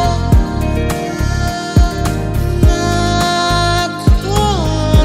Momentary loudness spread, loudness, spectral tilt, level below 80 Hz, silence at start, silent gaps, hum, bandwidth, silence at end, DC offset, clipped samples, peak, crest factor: 5 LU; -14 LUFS; -5.5 dB/octave; -18 dBFS; 0 s; none; none; 16 kHz; 0 s; under 0.1%; under 0.1%; 0 dBFS; 12 dB